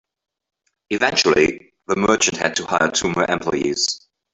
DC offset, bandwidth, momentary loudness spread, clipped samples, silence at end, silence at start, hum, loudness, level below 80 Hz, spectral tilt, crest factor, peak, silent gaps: under 0.1%; 8.4 kHz; 8 LU; under 0.1%; 0.35 s; 0.9 s; none; -18 LUFS; -52 dBFS; -2.5 dB/octave; 18 dB; -2 dBFS; none